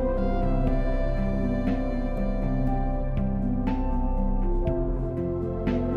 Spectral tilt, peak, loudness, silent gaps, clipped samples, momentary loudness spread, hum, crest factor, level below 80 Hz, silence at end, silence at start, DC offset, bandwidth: -10 dB/octave; -12 dBFS; -28 LUFS; none; under 0.1%; 3 LU; none; 12 dB; -28 dBFS; 0 s; 0 s; under 0.1%; 4.4 kHz